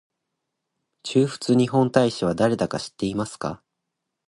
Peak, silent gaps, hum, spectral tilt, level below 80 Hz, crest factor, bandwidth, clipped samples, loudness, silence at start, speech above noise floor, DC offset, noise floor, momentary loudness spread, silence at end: -4 dBFS; none; none; -6 dB/octave; -56 dBFS; 20 dB; 11.5 kHz; under 0.1%; -23 LUFS; 1.05 s; 59 dB; under 0.1%; -81 dBFS; 13 LU; 0.7 s